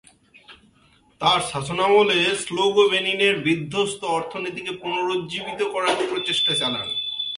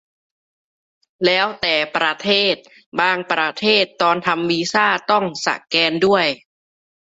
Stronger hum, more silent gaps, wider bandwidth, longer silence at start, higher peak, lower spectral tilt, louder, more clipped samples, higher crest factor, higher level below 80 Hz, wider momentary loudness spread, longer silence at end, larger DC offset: neither; second, none vs 2.86-2.92 s; first, 11.5 kHz vs 8 kHz; second, 0.5 s vs 1.2 s; about the same, -4 dBFS vs -2 dBFS; about the same, -3.5 dB/octave vs -3.5 dB/octave; second, -21 LUFS vs -17 LUFS; neither; about the same, 18 dB vs 16 dB; about the same, -60 dBFS vs -62 dBFS; first, 9 LU vs 5 LU; second, 0 s vs 0.85 s; neither